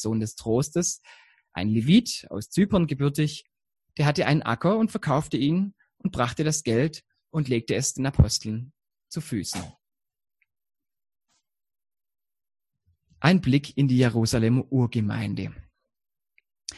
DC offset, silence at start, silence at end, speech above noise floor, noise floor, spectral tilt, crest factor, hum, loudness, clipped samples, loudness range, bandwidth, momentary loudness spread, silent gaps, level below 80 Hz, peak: under 0.1%; 0 s; 0 s; 47 dB; -71 dBFS; -5.5 dB/octave; 22 dB; none; -25 LUFS; under 0.1%; 9 LU; 12.5 kHz; 14 LU; none; -44 dBFS; -4 dBFS